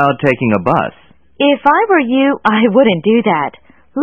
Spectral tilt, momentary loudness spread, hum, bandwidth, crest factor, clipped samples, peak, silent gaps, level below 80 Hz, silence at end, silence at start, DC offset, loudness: -8 dB/octave; 7 LU; none; 5.8 kHz; 12 dB; 0.1%; 0 dBFS; none; -52 dBFS; 0 s; 0 s; 0.4%; -12 LUFS